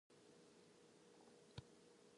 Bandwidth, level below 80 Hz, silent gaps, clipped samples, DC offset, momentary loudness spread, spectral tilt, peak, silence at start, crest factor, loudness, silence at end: 11 kHz; -82 dBFS; none; under 0.1%; under 0.1%; 7 LU; -4.5 dB/octave; -40 dBFS; 0.1 s; 26 dB; -66 LUFS; 0 s